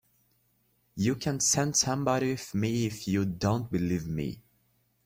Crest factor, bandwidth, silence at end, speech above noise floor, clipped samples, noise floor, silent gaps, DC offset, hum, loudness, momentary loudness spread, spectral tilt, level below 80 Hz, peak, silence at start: 20 dB; 16.5 kHz; 0.65 s; 42 dB; under 0.1%; -71 dBFS; none; under 0.1%; none; -29 LUFS; 10 LU; -4.5 dB/octave; -56 dBFS; -12 dBFS; 0.95 s